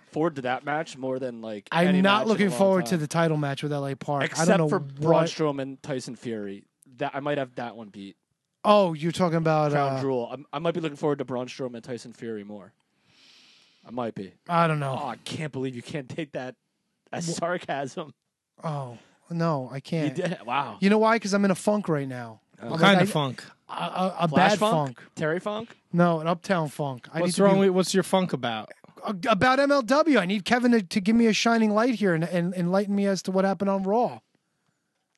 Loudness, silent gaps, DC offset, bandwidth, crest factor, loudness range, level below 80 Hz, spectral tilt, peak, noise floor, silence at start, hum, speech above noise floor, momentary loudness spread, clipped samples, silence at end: -25 LUFS; none; under 0.1%; 12.5 kHz; 22 dB; 10 LU; -68 dBFS; -5.5 dB/octave; -2 dBFS; -75 dBFS; 0.15 s; none; 50 dB; 16 LU; under 0.1%; 1 s